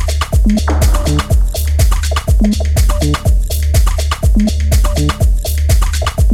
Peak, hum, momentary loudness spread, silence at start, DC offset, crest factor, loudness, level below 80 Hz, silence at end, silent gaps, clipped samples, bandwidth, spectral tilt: 0 dBFS; none; 2 LU; 0 s; under 0.1%; 10 dB; -14 LUFS; -12 dBFS; 0 s; none; under 0.1%; 16.5 kHz; -5.5 dB/octave